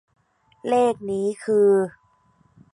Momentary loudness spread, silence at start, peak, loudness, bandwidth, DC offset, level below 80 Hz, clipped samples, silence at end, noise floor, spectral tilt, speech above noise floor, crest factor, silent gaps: 11 LU; 0.65 s; -8 dBFS; -21 LUFS; 11 kHz; under 0.1%; -66 dBFS; under 0.1%; 0.85 s; -61 dBFS; -6.5 dB/octave; 41 dB; 14 dB; none